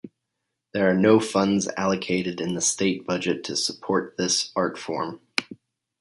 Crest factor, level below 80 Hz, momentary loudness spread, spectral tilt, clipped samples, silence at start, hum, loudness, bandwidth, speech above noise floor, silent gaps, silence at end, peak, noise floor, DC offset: 22 dB; -62 dBFS; 10 LU; -3.5 dB/octave; under 0.1%; 0.05 s; none; -24 LUFS; 11.5 kHz; 57 dB; none; 0.45 s; -2 dBFS; -81 dBFS; under 0.1%